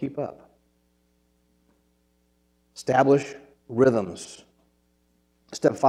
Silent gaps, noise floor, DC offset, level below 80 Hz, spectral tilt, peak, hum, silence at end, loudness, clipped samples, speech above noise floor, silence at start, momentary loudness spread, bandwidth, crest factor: none; -67 dBFS; under 0.1%; -66 dBFS; -6 dB/octave; -6 dBFS; none; 0 s; -24 LUFS; under 0.1%; 45 dB; 0 s; 24 LU; 12 kHz; 22 dB